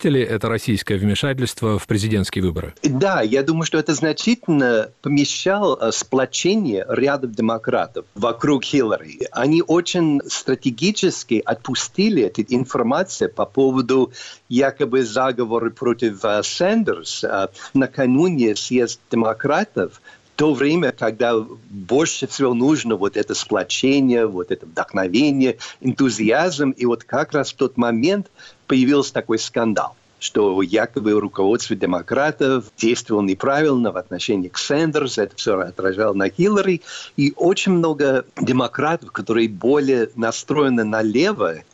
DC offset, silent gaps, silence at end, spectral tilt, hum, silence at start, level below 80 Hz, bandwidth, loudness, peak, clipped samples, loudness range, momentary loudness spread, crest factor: under 0.1%; none; 0.1 s; -5 dB/octave; none; 0 s; -54 dBFS; 13.5 kHz; -19 LUFS; -8 dBFS; under 0.1%; 1 LU; 6 LU; 12 dB